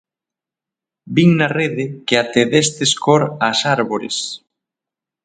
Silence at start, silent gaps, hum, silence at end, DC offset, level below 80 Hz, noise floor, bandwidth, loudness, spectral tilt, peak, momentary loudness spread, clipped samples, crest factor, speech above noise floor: 1.05 s; none; none; 0.9 s; under 0.1%; -60 dBFS; -87 dBFS; 9.4 kHz; -16 LUFS; -4.5 dB/octave; 0 dBFS; 9 LU; under 0.1%; 18 dB; 71 dB